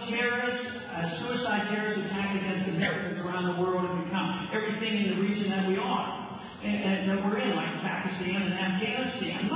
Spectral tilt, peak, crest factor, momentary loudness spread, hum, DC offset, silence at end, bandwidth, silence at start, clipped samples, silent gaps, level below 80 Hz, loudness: -4 dB/octave; -16 dBFS; 14 dB; 5 LU; none; under 0.1%; 0 s; 4 kHz; 0 s; under 0.1%; none; -62 dBFS; -30 LUFS